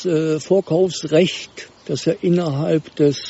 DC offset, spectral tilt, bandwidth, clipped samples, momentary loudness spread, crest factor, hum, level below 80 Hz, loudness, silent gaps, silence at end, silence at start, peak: under 0.1%; -6 dB/octave; 8 kHz; under 0.1%; 11 LU; 16 dB; none; -58 dBFS; -19 LUFS; none; 0 s; 0 s; -2 dBFS